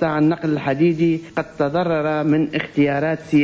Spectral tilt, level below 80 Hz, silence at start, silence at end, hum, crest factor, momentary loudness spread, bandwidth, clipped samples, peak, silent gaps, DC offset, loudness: -8 dB/octave; -52 dBFS; 0 s; 0 s; none; 12 dB; 4 LU; 8 kHz; under 0.1%; -6 dBFS; none; under 0.1%; -19 LUFS